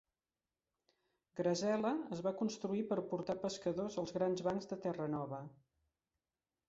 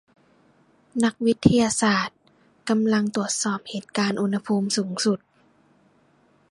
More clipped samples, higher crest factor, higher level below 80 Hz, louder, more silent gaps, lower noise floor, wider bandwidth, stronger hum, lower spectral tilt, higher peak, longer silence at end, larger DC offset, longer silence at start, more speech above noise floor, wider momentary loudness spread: neither; second, 18 dB vs 24 dB; second, -76 dBFS vs -52 dBFS; second, -39 LUFS vs -23 LUFS; neither; first, under -90 dBFS vs -61 dBFS; second, 8 kHz vs 11.5 kHz; neither; first, -6 dB/octave vs -4.5 dB/octave; second, -24 dBFS vs -2 dBFS; second, 1.15 s vs 1.35 s; neither; first, 1.35 s vs 0.95 s; first, over 51 dB vs 39 dB; second, 7 LU vs 11 LU